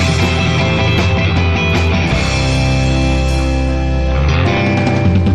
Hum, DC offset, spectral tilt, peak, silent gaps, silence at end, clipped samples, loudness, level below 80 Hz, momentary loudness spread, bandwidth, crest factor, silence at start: none; 2%; -6 dB/octave; -2 dBFS; none; 0 s; under 0.1%; -14 LUFS; -20 dBFS; 3 LU; 11 kHz; 10 dB; 0 s